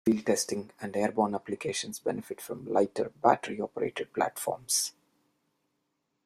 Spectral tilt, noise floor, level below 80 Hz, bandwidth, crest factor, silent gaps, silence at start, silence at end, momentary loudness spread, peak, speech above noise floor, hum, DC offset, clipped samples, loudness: -3.5 dB/octave; -79 dBFS; -72 dBFS; 16 kHz; 24 dB; none; 0.05 s; 1.35 s; 9 LU; -8 dBFS; 49 dB; none; under 0.1%; under 0.1%; -31 LUFS